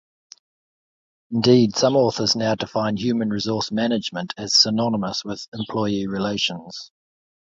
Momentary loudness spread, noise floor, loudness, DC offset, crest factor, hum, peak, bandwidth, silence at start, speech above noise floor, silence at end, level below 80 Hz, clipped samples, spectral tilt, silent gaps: 13 LU; under -90 dBFS; -21 LUFS; under 0.1%; 20 dB; none; -4 dBFS; 7.8 kHz; 1.3 s; over 69 dB; 0.6 s; -58 dBFS; under 0.1%; -4.5 dB/octave; 5.48-5.52 s